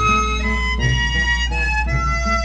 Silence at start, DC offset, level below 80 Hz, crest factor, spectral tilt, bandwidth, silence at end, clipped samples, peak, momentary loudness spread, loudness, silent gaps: 0 s; under 0.1%; -22 dBFS; 14 dB; -4 dB/octave; 8.6 kHz; 0 s; under 0.1%; -4 dBFS; 2 LU; -18 LUFS; none